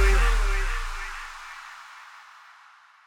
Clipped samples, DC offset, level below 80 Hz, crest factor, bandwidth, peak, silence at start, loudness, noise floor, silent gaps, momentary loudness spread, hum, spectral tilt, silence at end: under 0.1%; under 0.1%; -26 dBFS; 16 dB; 13 kHz; -10 dBFS; 0 s; -29 LUFS; -54 dBFS; none; 24 LU; none; -4 dB/octave; 0.9 s